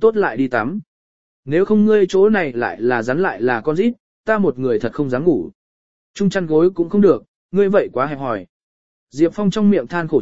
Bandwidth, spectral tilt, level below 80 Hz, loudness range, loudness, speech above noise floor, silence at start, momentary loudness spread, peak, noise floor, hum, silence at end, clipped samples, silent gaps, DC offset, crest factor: 7.8 kHz; -7.5 dB/octave; -52 dBFS; 2 LU; -17 LUFS; over 74 dB; 0 s; 9 LU; -2 dBFS; under -90 dBFS; none; 0 s; under 0.1%; 0.87-1.43 s, 4.00-4.24 s, 5.55-6.14 s, 7.28-7.49 s, 8.49-9.07 s; 1%; 16 dB